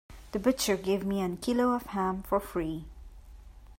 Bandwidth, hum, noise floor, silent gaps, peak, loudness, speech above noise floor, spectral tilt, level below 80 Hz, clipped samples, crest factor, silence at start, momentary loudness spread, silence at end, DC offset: 16.5 kHz; none; -49 dBFS; none; -14 dBFS; -30 LUFS; 20 dB; -5 dB/octave; -50 dBFS; under 0.1%; 18 dB; 0.1 s; 10 LU; 0.05 s; under 0.1%